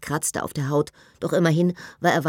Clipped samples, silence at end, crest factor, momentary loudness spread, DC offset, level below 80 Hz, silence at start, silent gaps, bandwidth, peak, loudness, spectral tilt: under 0.1%; 0 s; 18 dB; 8 LU; under 0.1%; -58 dBFS; 0 s; none; 17 kHz; -6 dBFS; -24 LUFS; -5.5 dB/octave